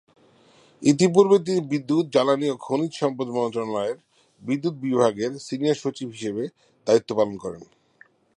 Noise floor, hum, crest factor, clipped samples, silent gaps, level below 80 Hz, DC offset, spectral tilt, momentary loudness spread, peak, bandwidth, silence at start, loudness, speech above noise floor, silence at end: -57 dBFS; none; 20 dB; under 0.1%; none; -68 dBFS; under 0.1%; -6 dB/octave; 14 LU; -4 dBFS; 11 kHz; 0.8 s; -23 LUFS; 34 dB; 0.75 s